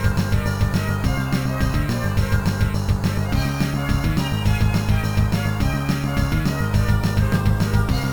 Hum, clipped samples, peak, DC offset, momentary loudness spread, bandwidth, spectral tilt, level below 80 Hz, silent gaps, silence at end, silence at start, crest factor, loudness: none; under 0.1%; -6 dBFS; 1%; 2 LU; over 20 kHz; -6.5 dB/octave; -26 dBFS; none; 0 s; 0 s; 14 dB; -21 LUFS